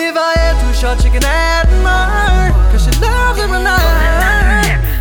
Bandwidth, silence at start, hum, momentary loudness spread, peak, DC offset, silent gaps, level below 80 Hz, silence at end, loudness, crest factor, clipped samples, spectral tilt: 19.5 kHz; 0 s; none; 2 LU; 0 dBFS; under 0.1%; none; -12 dBFS; 0 s; -12 LUFS; 10 dB; under 0.1%; -4.5 dB/octave